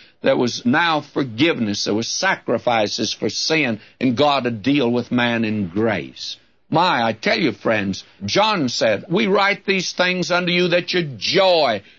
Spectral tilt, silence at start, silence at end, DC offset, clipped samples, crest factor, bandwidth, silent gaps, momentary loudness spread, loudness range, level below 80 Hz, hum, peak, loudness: -4 dB/octave; 0.25 s; 0.2 s; 0.1%; under 0.1%; 16 dB; 7.8 kHz; none; 5 LU; 2 LU; -62 dBFS; none; -4 dBFS; -19 LUFS